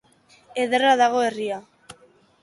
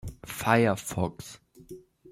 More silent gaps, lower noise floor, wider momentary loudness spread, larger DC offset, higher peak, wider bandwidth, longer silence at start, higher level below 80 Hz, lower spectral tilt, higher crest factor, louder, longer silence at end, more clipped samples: neither; first, -56 dBFS vs -49 dBFS; second, 15 LU vs 25 LU; neither; about the same, -6 dBFS vs -6 dBFS; second, 11.5 kHz vs 16.5 kHz; first, 0.55 s vs 0.05 s; second, -70 dBFS vs -52 dBFS; second, -3 dB/octave vs -5.5 dB/octave; second, 16 dB vs 24 dB; first, -21 LUFS vs -27 LUFS; first, 0.5 s vs 0.35 s; neither